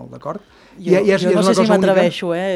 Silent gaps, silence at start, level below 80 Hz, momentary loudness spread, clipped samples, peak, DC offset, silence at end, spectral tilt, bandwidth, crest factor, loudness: none; 0 s; -56 dBFS; 16 LU; under 0.1%; 0 dBFS; under 0.1%; 0 s; -6 dB/octave; 12.5 kHz; 16 dB; -15 LUFS